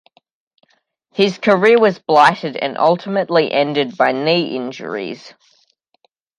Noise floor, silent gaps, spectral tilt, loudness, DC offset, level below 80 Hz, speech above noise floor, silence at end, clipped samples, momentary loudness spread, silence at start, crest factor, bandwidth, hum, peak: -63 dBFS; none; -5.5 dB/octave; -16 LUFS; under 0.1%; -68 dBFS; 47 dB; 1.1 s; under 0.1%; 13 LU; 1.15 s; 16 dB; 11 kHz; none; 0 dBFS